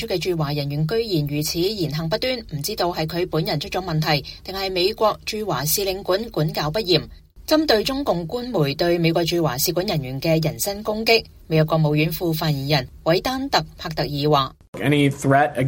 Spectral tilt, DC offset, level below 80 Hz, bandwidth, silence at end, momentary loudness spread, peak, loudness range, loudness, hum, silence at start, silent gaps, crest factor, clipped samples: -5 dB/octave; under 0.1%; -44 dBFS; 17 kHz; 0 s; 6 LU; -2 dBFS; 3 LU; -21 LUFS; none; 0 s; 14.68-14.73 s; 18 dB; under 0.1%